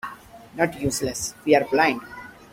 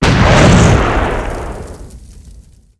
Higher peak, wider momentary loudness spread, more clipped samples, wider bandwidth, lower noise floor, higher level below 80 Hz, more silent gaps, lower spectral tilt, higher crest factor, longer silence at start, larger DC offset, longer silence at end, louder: second, -4 dBFS vs 0 dBFS; about the same, 20 LU vs 20 LU; second, under 0.1% vs 0.8%; first, 16.5 kHz vs 11 kHz; about the same, -43 dBFS vs -40 dBFS; second, -52 dBFS vs -20 dBFS; neither; second, -4 dB/octave vs -5.5 dB/octave; first, 20 dB vs 12 dB; about the same, 0.05 s vs 0 s; neither; second, 0.2 s vs 0.4 s; second, -23 LUFS vs -10 LUFS